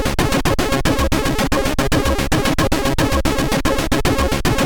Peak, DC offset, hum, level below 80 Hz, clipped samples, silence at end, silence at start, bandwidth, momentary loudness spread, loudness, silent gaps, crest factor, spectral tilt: -4 dBFS; under 0.1%; none; -24 dBFS; under 0.1%; 0 s; 0 s; over 20 kHz; 1 LU; -18 LUFS; none; 14 dB; -4.5 dB/octave